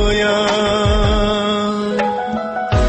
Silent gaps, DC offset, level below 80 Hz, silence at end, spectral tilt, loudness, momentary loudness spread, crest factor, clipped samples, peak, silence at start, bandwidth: none; under 0.1%; -24 dBFS; 0 s; -5.5 dB/octave; -17 LUFS; 5 LU; 12 dB; under 0.1%; -4 dBFS; 0 s; 8.6 kHz